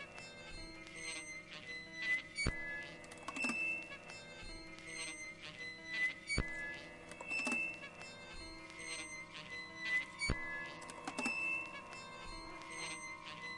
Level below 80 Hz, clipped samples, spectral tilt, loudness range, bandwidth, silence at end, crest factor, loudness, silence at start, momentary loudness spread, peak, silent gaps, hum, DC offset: -56 dBFS; under 0.1%; -2.5 dB/octave; 2 LU; 11.5 kHz; 0 s; 26 dB; -42 LUFS; 0 s; 13 LU; -18 dBFS; none; none; under 0.1%